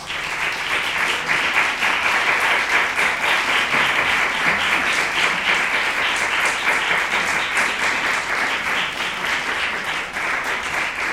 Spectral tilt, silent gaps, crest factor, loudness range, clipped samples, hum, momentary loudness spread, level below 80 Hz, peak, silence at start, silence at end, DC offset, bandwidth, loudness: -1 dB/octave; none; 16 dB; 3 LU; under 0.1%; none; 5 LU; -50 dBFS; -4 dBFS; 0 s; 0 s; under 0.1%; 16.5 kHz; -18 LUFS